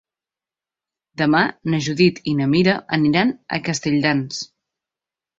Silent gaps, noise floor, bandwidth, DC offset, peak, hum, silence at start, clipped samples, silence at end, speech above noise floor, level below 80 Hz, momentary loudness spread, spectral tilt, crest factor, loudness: none; -90 dBFS; 8 kHz; under 0.1%; -2 dBFS; none; 1.2 s; under 0.1%; 0.95 s; 71 dB; -56 dBFS; 10 LU; -5.5 dB/octave; 18 dB; -19 LUFS